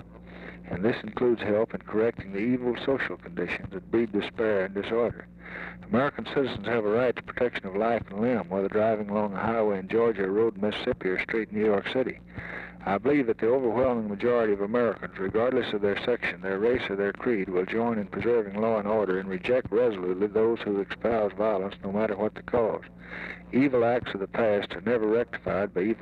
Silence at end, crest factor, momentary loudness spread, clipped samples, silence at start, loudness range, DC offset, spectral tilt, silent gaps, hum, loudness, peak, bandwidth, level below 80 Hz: 0 s; 14 dB; 7 LU; under 0.1%; 0 s; 2 LU; under 0.1%; -8 dB/octave; none; none; -27 LUFS; -14 dBFS; 6.2 kHz; -56 dBFS